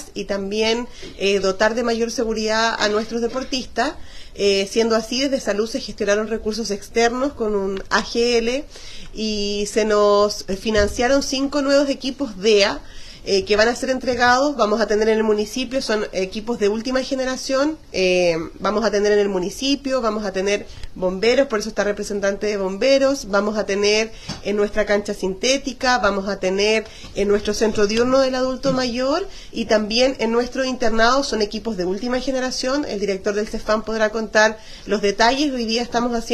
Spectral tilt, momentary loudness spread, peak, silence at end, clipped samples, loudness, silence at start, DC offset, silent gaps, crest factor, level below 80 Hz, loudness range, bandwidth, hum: -3.5 dB/octave; 8 LU; -2 dBFS; 0 s; under 0.1%; -20 LUFS; 0 s; under 0.1%; none; 18 dB; -40 dBFS; 3 LU; 13 kHz; none